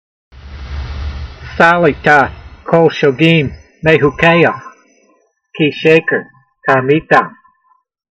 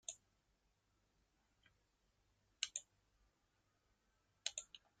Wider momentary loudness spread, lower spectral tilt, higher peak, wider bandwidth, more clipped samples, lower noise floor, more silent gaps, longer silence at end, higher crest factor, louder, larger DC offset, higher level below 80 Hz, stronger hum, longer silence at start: first, 17 LU vs 13 LU; first, -7 dB/octave vs 2.5 dB/octave; first, 0 dBFS vs -20 dBFS; second, 8.4 kHz vs 13 kHz; first, 0.1% vs under 0.1%; second, -57 dBFS vs -82 dBFS; neither; first, 0.8 s vs 0.25 s; second, 14 dB vs 38 dB; first, -11 LUFS vs -48 LUFS; neither; first, -32 dBFS vs -84 dBFS; neither; first, 0.45 s vs 0.1 s